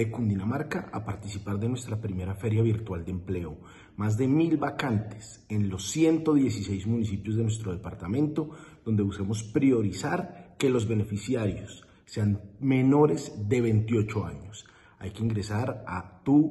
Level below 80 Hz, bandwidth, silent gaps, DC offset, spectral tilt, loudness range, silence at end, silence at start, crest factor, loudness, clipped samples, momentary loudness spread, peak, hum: -54 dBFS; 12 kHz; none; under 0.1%; -7 dB/octave; 3 LU; 0 s; 0 s; 18 dB; -28 LUFS; under 0.1%; 14 LU; -10 dBFS; none